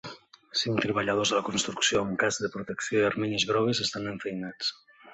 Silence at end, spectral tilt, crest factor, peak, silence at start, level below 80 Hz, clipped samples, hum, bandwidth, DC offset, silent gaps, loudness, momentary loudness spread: 0 s; -3 dB/octave; 20 dB; -10 dBFS; 0.05 s; -62 dBFS; under 0.1%; none; 8.4 kHz; under 0.1%; none; -28 LUFS; 9 LU